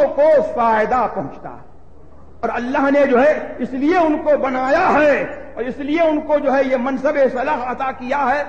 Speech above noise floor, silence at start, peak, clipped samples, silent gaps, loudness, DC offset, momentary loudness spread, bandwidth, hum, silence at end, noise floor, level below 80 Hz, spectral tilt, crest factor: 28 dB; 0 s; -4 dBFS; under 0.1%; none; -17 LUFS; 1%; 12 LU; 7.6 kHz; none; 0 s; -44 dBFS; -46 dBFS; -6 dB/octave; 12 dB